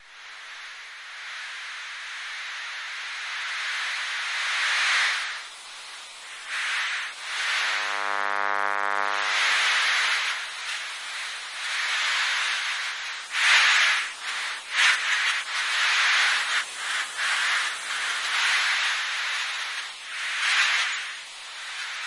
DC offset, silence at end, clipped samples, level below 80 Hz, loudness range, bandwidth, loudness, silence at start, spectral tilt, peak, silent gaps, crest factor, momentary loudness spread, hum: under 0.1%; 0 s; under 0.1%; -80 dBFS; 6 LU; 11.5 kHz; -24 LUFS; 0 s; 3.5 dB/octave; -6 dBFS; none; 20 dB; 15 LU; none